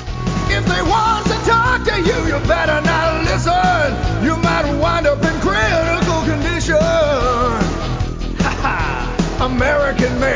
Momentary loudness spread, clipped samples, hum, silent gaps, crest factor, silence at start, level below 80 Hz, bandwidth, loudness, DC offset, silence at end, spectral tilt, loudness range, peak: 5 LU; under 0.1%; none; none; 12 dB; 0 s; -24 dBFS; 7.6 kHz; -16 LUFS; under 0.1%; 0 s; -5.5 dB/octave; 2 LU; -2 dBFS